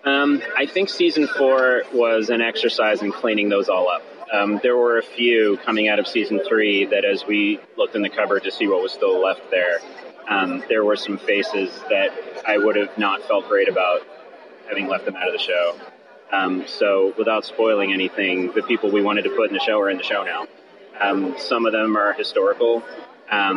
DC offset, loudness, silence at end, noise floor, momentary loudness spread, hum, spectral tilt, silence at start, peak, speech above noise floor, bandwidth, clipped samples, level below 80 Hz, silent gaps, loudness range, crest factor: under 0.1%; -20 LUFS; 0 s; -43 dBFS; 6 LU; none; -5 dB/octave; 0.05 s; -6 dBFS; 23 dB; 10.5 kHz; under 0.1%; -74 dBFS; none; 3 LU; 14 dB